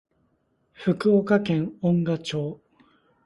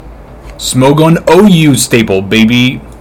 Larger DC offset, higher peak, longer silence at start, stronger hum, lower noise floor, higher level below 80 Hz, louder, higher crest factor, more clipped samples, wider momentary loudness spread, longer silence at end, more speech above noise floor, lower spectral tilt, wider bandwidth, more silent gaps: neither; second, -6 dBFS vs 0 dBFS; first, 0.8 s vs 0.05 s; neither; first, -69 dBFS vs -29 dBFS; second, -62 dBFS vs -32 dBFS; second, -24 LUFS vs -7 LUFS; first, 20 dB vs 8 dB; second, under 0.1% vs 5%; first, 10 LU vs 7 LU; first, 0.7 s vs 0.05 s; first, 46 dB vs 22 dB; first, -7.5 dB/octave vs -5 dB/octave; second, 11.5 kHz vs 19 kHz; neither